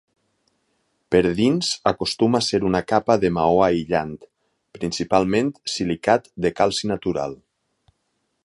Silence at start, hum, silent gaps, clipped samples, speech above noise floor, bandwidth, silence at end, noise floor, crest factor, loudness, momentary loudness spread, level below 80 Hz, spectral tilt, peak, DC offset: 1.1 s; none; none; under 0.1%; 52 dB; 11.5 kHz; 1.1 s; -72 dBFS; 20 dB; -21 LUFS; 8 LU; -50 dBFS; -5 dB/octave; -2 dBFS; under 0.1%